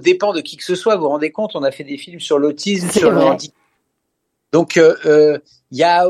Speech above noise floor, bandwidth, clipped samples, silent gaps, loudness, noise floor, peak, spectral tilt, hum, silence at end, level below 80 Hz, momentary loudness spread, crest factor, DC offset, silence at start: 58 dB; 14.5 kHz; under 0.1%; none; -15 LUFS; -72 dBFS; 0 dBFS; -5 dB/octave; none; 0 s; -60 dBFS; 13 LU; 16 dB; under 0.1%; 0.05 s